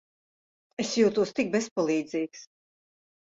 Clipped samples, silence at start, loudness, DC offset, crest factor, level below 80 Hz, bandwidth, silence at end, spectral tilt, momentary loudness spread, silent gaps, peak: under 0.1%; 0.8 s; -27 LUFS; under 0.1%; 18 dB; -70 dBFS; 8 kHz; 0.8 s; -4.5 dB/octave; 13 LU; 1.71-1.76 s; -10 dBFS